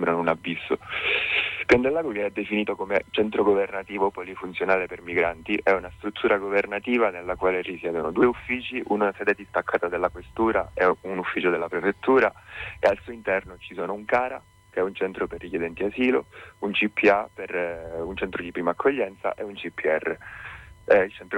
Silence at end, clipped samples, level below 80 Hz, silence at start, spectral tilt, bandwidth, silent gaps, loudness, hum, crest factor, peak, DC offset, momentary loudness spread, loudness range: 0 s; under 0.1%; -52 dBFS; 0 s; -6 dB/octave; 10.5 kHz; none; -25 LUFS; none; 18 dB; -6 dBFS; under 0.1%; 11 LU; 4 LU